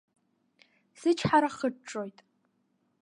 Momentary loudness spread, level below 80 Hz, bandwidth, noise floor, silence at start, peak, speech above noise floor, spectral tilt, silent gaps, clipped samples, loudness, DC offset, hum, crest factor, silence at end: 14 LU; -66 dBFS; 11 kHz; -74 dBFS; 1 s; -10 dBFS; 46 dB; -5.5 dB/octave; none; under 0.1%; -29 LUFS; under 0.1%; none; 22 dB; 0.9 s